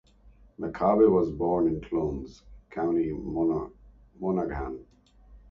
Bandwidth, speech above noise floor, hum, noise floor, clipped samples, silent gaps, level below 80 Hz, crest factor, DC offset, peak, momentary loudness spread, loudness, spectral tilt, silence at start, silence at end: 6.6 kHz; 30 dB; none; -56 dBFS; under 0.1%; none; -48 dBFS; 18 dB; under 0.1%; -10 dBFS; 17 LU; -27 LUFS; -10 dB/octave; 0.6 s; 0.1 s